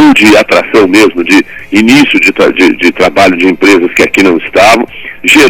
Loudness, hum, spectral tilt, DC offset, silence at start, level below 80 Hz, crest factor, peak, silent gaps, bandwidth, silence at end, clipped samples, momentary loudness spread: -5 LUFS; none; -4 dB/octave; under 0.1%; 0 s; -38 dBFS; 6 dB; 0 dBFS; none; 19 kHz; 0 s; 8%; 4 LU